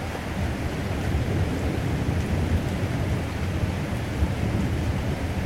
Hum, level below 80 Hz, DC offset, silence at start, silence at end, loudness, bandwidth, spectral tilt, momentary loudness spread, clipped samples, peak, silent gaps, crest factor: none; -34 dBFS; under 0.1%; 0 s; 0 s; -27 LUFS; 16 kHz; -6.5 dB/octave; 3 LU; under 0.1%; -12 dBFS; none; 14 dB